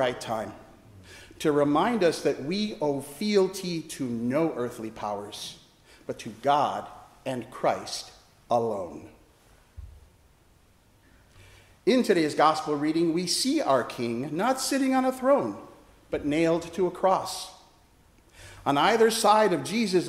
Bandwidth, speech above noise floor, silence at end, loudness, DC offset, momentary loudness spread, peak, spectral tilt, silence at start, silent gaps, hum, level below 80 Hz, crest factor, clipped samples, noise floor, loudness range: 16 kHz; 34 dB; 0 s; -26 LUFS; under 0.1%; 14 LU; -6 dBFS; -4.5 dB/octave; 0 s; none; none; -58 dBFS; 20 dB; under 0.1%; -60 dBFS; 8 LU